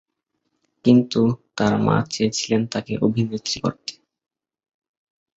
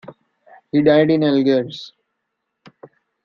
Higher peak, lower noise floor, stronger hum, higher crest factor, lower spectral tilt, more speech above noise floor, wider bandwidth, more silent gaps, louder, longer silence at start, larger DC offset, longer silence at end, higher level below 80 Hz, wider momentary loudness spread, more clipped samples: about the same, -2 dBFS vs -2 dBFS; about the same, -75 dBFS vs -76 dBFS; neither; about the same, 20 dB vs 18 dB; second, -5.5 dB/octave vs -8 dB/octave; second, 55 dB vs 61 dB; first, 8 kHz vs 6.8 kHz; neither; second, -21 LUFS vs -16 LUFS; first, 0.85 s vs 0.1 s; neither; about the same, 1.5 s vs 1.4 s; first, -54 dBFS vs -62 dBFS; second, 9 LU vs 19 LU; neither